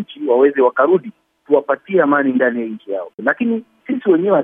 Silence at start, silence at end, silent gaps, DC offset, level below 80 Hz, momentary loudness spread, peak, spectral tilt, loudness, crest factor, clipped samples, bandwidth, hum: 0 s; 0 s; 3.14-3.18 s; under 0.1%; -74 dBFS; 11 LU; 0 dBFS; -9.5 dB/octave; -16 LUFS; 16 dB; under 0.1%; 3.7 kHz; none